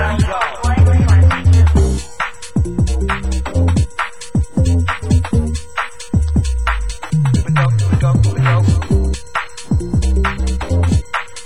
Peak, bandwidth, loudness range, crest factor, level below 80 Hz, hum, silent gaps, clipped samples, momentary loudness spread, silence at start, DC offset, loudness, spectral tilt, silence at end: -2 dBFS; 11.5 kHz; 3 LU; 12 dB; -18 dBFS; none; none; under 0.1%; 10 LU; 0 s; 3%; -16 LUFS; -6.5 dB/octave; 0 s